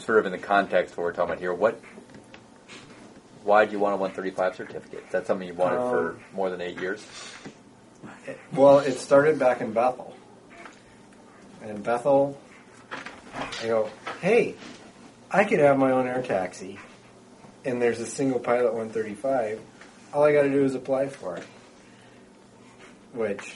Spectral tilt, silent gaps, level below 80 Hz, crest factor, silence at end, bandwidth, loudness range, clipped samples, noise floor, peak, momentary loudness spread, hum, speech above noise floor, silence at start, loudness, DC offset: -5.5 dB/octave; none; -66 dBFS; 22 dB; 0 s; 11.5 kHz; 6 LU; under 0.1%; -52 dBFS; -4 dBFS; 23 LU; none; 27 dB; 0 s; -25 LUFS; under 0.1%